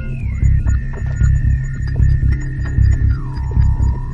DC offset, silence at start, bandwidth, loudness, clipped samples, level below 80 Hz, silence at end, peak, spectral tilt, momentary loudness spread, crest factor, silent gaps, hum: under 0.1%; 0 s; 7.4 kHz; -17 LUFS; under 0.1%; -16 dBFS; 0 s; -2 dBFS; -8 dB/octave; 6 LU; 12 dB; none; none